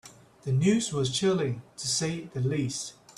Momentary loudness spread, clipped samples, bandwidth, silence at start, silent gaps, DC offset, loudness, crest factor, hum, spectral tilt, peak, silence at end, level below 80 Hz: 9 LU; under 0.1%; 13 kHz; 0.05 s; none; under 0.1%; -28 LUFS; 18 dB; none; -5 dB/octave; -12 dBFS; 0.05 s; -62 dBFS